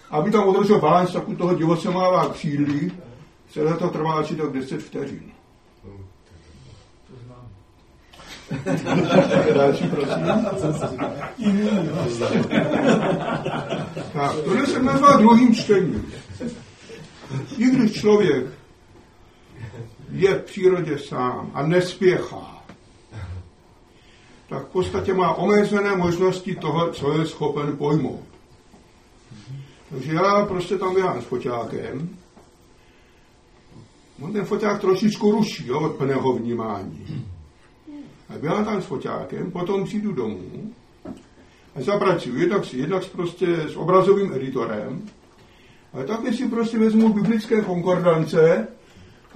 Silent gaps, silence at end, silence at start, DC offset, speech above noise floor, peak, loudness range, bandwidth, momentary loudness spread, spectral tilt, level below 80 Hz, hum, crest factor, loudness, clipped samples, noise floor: none; 0.3 s; 0.1 s; under 0.1%; 33 dB; -2 dBFS; 10 LU; 11 kHz; 20 LU; -7 dB/octave; -54 dBFS; none; 20 dB; -21 LUFS; under 0.1%; -53 dBFS